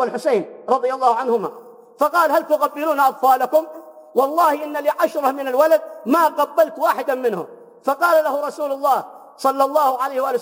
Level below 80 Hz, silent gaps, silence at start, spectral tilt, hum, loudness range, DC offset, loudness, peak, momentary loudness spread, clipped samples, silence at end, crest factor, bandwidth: -88 dBFS; none; 0 s; -4 dB/octave; none; 2 LU; under 0.1%; -19 LUFS; -4 dBFS; 7 LU; under 0.1%; 0 s; 16 dB; 17 kHz